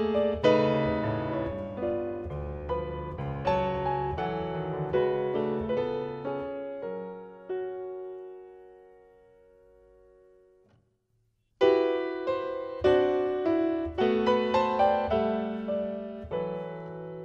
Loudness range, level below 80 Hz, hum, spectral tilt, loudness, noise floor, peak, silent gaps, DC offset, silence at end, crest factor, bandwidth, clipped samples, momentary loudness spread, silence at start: 14 LU; -50 dBFS; none; -8 dB/octave; -29 LUFS; -72 dBFS; -10 dBFS; none; under 0.1%; 0 s; 18 dB; 7.4 kHz; under 0.1%; 13 LU; 0 s